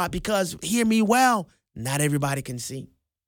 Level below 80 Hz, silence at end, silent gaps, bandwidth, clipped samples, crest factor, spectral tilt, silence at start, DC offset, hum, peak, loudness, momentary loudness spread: -50 dBFS; 0.45 s; none; 18.5 kHz; under 0.1%; 16 dB; -4.5 dB/octave; 0 s; under 0.1%; none; -8 dBFS; -23 LUFS; 15 LU